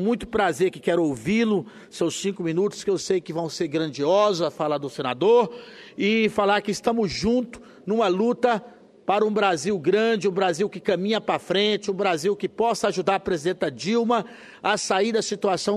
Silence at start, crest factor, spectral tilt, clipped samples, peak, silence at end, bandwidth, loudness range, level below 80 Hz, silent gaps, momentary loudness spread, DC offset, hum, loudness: 0 s; 16 dB; -4.5 dB/octave; under 0.1%; -6 dBFS; 0 s; 13 kHz; 2 LU; -56 dBFS; none; 7 LU; under 0.1%; none; -23 LUFS